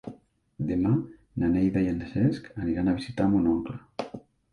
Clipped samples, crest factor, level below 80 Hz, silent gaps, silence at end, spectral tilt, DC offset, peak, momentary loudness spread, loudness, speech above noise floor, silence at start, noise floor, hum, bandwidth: under 0.1%; 14 dB; -48 dBFS; none; 0.35 s; -9 dB/octave; under 0.1%; -12 dBFS; 14 LU; -27 LUFS; 26 dB; 0.05 s; -51 dBFS; none; 10.5 kHz